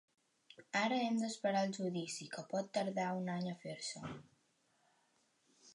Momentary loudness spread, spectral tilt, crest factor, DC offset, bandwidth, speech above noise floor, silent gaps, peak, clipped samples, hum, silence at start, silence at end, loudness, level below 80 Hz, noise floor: 9 LU; -4.5 dB/octave; 18 dB; under 0.1%; 11.5 kHz; 38 dB; none; -22 dBFS; under 0.1%; none; 0.5 s; 0 s; -39 LUFS; -82 dBFS; -77 dBFS